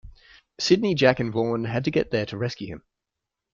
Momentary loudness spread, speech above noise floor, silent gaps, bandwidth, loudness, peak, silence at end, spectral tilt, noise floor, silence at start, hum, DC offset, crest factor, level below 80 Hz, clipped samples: 14 LU; 62 dB; none; 7.6 kHz; -24 LUFS; -4 dBFS; 0.75 s; -5.5 dB/octave; -85 dBFS; 0.05 s; none; under 0.1%; 20 dB; -54 dBFS; under 0.1%